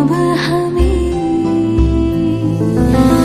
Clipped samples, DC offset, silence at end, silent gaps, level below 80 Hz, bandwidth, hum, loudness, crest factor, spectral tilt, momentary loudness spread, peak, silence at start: under 0.1%; under 0.1%; 0 s; none; -20 dBFS; 14.5 kHz; none; -14 LUFS; 12 dB; -7.5 dB/octave; 4 LU; 0 dBFS; 0 s